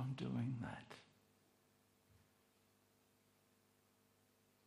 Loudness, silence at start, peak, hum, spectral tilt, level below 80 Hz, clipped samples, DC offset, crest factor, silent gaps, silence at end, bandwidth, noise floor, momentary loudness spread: -46 LUFS; 0 s; -32 dBFS; 50 Hz at -85 dBFS; -7.5 dB/octave; -80 dBFS; under 0.1%; under 0.1%; 20 dB; none; 3.6 s; 15.5 kHz; -76 dBFS; 17 LU